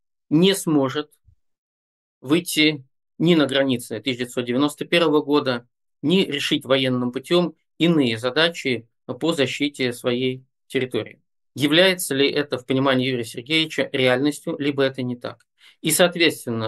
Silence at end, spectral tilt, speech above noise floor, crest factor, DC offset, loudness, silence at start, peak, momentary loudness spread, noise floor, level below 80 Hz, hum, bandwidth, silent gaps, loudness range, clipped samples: 0 s; -4.5 dB/octave; over 69 dB; 20 dB; under 0.1%; -21 LUFS; 0.3 s; -2 dBFS; 11 LU; under -90 dBFS; -68 dBFS; none; 12.5 kHz; 1.58-2.21 s; 2 LU; under 0.1%